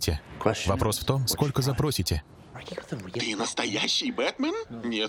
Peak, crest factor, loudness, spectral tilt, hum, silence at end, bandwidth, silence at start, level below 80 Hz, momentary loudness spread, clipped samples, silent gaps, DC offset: -8 dBFS; 20 dB; -27 LUFS; -4 dB/octave; none; 0 s; 18.5 kHz; 0 s; -44 dBFS; 12 LU; under 0.1%; none; under 0.1%